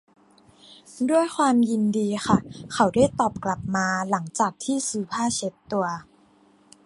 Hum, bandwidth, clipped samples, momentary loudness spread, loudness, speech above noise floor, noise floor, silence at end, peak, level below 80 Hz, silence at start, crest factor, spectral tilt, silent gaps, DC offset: none; 11.5 kHz; under 0.1%; 9 LU; -24 LUFS; 34 dB; -58 dBFS; 0.85 s; -4 dBFS; -54 dBFS; 0.7 s; 20 dB; -5 dB/octave; none; under 0.1%